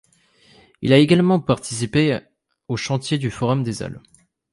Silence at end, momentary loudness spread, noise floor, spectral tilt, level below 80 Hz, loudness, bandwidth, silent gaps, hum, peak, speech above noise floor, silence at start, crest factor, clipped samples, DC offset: 0.55 s; 14 LU; -56 dBFS; -6 dB/octave; -52 dBFS; -20 LUFS; 11.5 kHz; none; none; -2 dBFS; 37 dB; 0.8 s; 18 dB; under 0.1%; under 0.1%